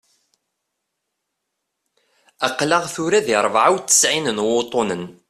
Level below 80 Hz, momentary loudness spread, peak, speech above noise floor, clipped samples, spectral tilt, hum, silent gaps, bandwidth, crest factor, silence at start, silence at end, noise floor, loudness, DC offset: -62 dBFS; 9 LU; -2 dBFS; 59 dB; under 0.1%; -2 dB/octave; none; none; 15 kHz; 20 dB; 2.4 s; 0.15 s; -78 dBFS; -18 LUFS; under 0.1%